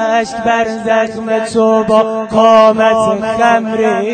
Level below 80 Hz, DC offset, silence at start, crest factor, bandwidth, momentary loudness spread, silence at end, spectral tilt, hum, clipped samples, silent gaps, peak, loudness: -48 dBFS; under 0.1%; 0 s; 12 dB; 9.2 kHz; 7 LU; 0 s; -5 dB/octave; none; 0.3%; none; 0 dBFS; -11 LUFS